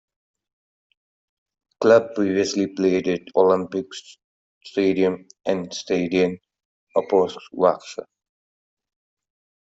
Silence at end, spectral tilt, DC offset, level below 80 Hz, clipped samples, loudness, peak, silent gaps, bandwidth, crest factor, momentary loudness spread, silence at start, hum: 1.7 s; -5.5 dB/octave; under 0.1%; -66 dBFS; under 0.1%; -21 LUFS; -4 dBFS; 4.24-4.61 s, 6.65-6.87 s; 8 kHz; 20 dB; 13 LU; 1.8 s; none